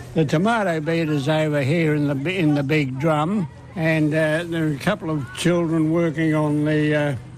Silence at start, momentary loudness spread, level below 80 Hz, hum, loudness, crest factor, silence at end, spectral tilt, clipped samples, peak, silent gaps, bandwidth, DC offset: 0 s; 4 LU; -54 dBFS; none; -21 LUFS; 12 dB; 0 s; -7 dB/octave; under 0.1%; -10 dBFS; none; 13.5 kHz; under 0.1%